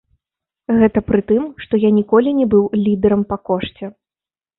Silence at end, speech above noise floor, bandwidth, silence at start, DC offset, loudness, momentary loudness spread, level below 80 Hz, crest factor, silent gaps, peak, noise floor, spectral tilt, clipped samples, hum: 0.7 s; over 75 dB; 4.1 kHz; 0.7 s; under 0.1%; -16 LUFS; 11 LU; -44 dBFS; 14 dB; none; -2 dBFS; under -90 dBFS; -12.5 dB/octave; under 0.1%; none